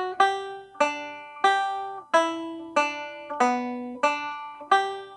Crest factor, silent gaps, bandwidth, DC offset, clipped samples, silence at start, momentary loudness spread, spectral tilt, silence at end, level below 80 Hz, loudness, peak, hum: 22 dB; none; 11 kHz; under 0.1%; under 0.1%; 0 s; 11 LU; -2 dB/octave; 0 s; -74 dBFS; -26 LUFS; -6 dBFS; none